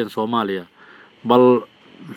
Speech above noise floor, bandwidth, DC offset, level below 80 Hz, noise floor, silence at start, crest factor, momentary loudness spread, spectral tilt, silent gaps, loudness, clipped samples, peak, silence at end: 30 dB; 16.5 kHz; under 0.1%; -72 dBFS; -47 dBFS; 0 s; 18 dB; 15 LU; -7.5 dB/octave; none; -18 LUFS; under 0.1%; -2 dBFS; 0 s